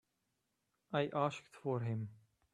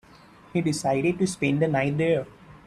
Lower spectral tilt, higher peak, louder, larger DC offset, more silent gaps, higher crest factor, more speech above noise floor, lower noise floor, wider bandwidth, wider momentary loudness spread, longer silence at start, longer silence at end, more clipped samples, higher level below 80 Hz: about the same, -7 dB/octave vs -6 dB/octave; second, -20 dBFS vs -10 dBFS; second, -40 LUFS vs -25 LUFS; neither; neither; first, 22 dB vs 16 dB; first, 46 dB vs 27 dB; first, -85 dBFS vs -51 dBFS; second, 10.5 kHz vs 13 kHz; first, 8 LU vs 4 LU; first, 0.9 s vs 0.55 s; first, 0.4 s vs 0.1 s; neither; second, -80 dBFS vs -58 dBFS